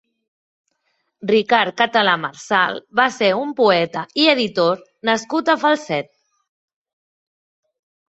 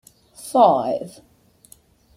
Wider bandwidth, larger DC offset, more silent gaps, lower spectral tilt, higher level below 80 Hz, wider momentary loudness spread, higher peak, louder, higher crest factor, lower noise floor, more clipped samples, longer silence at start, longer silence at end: second, 8.2 kHz vs 15.5 kHz; neither; neither; second, -4 dB/octave vs -5.5 dB/octave; about the same, -66 dBFS vs -64 dBFS; second, 7 LU vs 23 LU; about the same, 0 dBFS vs -2 dBFS; about the same, -18 LUFS vs -18 LUFS; about the same, 20 dB vs 20 dB; first, -70 dBFS vs -53 dBFS; neither; first, 1.2 s vs 0.4 s; first, 2.05 s vs 1.05 s